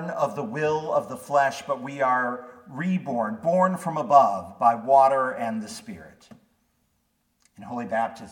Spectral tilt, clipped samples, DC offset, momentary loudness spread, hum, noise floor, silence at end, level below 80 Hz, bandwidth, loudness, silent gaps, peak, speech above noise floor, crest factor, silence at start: -6 dB/octave; under 0.1%; under 0.1%; 17 LU; none; -71 dBFS; 0 s; -70 dBFS; 17 kHz; -24 LUFS; none; -4 dBFS; 47 dB; 20 dB; 0 s